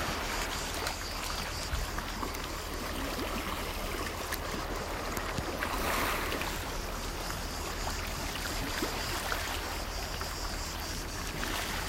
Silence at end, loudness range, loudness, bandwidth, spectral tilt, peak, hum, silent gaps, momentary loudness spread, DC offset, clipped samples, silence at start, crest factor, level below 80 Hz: 0 s; 2 LU; -35 LUFS; 16 kHz; -3 dB/octave; -16 dBFS; none; none; 4 LU; under 0.1%; under 0.1%; 0 s; 20 dB; -42 dBFS